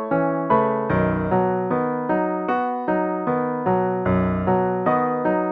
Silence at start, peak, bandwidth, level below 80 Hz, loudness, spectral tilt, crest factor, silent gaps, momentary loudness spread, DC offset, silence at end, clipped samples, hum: 0 s; -6 dBFS; 4.2 kHz; -46 dBFS; -21 LUFS; -11 dB/octave; 14 dB; none; 3 LU; under 0.1%; 0 s; under 0.1%; none